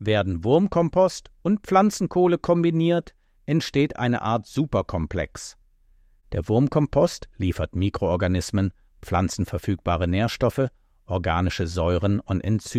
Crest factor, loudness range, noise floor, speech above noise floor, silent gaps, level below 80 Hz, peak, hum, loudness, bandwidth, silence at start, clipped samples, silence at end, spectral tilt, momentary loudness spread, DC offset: 18 dB; 4 LU; -57 dBFS; 35 dB; none; -42 dBFS; -6 dBFS; none; -23 LUFS; 14.5 kHz; 0 s; under 0.1%; 0 s; -6.5 dB/octave; 9 LU; under 0.1%